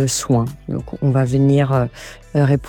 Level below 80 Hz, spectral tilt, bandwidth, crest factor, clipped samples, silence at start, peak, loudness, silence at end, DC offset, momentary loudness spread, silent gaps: -42 dBFS; -6.5 dB/octave; 17 kHz; 14 dB; under 0.1%; 0 s; -4 dBFS; -18 LUFS; 0 s; under 0.1%; 12 LU; none